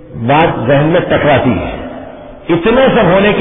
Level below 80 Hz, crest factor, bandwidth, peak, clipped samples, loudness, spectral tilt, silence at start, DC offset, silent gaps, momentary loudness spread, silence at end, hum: -34 dBFS; 10 dB; 3.9 kHz; 0 dBFS; under 0.1%; -10 LUFS; -10.5 dB/octave; 0 s; under 0.1%; none; 18 LU; 0 s; none